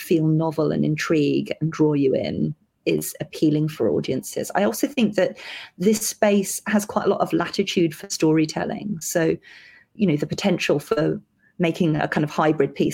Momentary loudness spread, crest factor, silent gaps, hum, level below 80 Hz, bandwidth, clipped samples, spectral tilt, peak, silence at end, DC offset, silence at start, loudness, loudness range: 7 LU; 18 dB; none; none; -60 dBFS; 17 kHz; under 0.1%; -5.5 dB/octave; -4 dBFS; 0 s; under 0.1%; 0 s; -22 LUFS; 2 LU